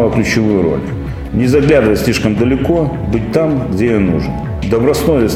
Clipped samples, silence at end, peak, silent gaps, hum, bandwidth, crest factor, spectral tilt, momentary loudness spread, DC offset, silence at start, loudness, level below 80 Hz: under 0.1%; 0 s; 0 dBFS; none; none; 16.5 kHz; 12 dB; -6.5 dB/octave; 9 LU; under 0.1%; 0 s; -13 LUFS; -28 dBFS